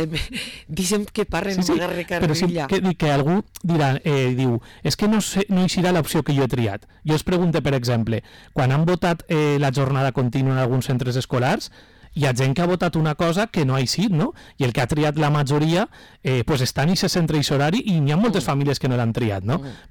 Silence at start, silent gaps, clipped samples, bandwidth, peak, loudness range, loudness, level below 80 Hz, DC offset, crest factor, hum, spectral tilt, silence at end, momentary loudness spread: 0 s; none; under 0.1%; 18 kHz; -14 dBFS; 1 LU; -21 LUFS; -44 dBFS; under 0.1%; 6 dB; none; -6 dB/octave; 0.1 s; 6 LU